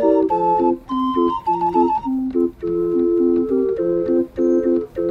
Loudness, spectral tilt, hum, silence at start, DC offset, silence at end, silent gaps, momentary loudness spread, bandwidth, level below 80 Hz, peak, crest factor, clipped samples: -19 LUFS; -9 dB/octave; none; 0 s; under 0.1%; 0 s; none; 4 LU; 5 kHz; -46 dBFS; -4 dBFS; 14 dB; under 0.1%